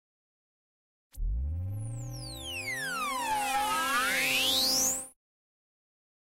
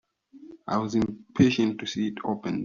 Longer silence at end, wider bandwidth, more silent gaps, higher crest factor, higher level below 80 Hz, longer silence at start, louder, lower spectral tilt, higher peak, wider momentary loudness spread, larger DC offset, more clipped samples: first, 1.2 s vs 0 s; first, 16 kHz vs 7.4 kHz; neither; second, 16 dB vs 22 dB; first, -44 dBFS vs -58 dBFS; first, 1.15 s vs 0.35 s; second, -29 LUFS vs -26 LUFS; second, -1.5 dB/octave vs -5.5 dB/octave; second, -16 dBFS vs -6 dBFS; first, 15 LU vs 9 LU; neither; neither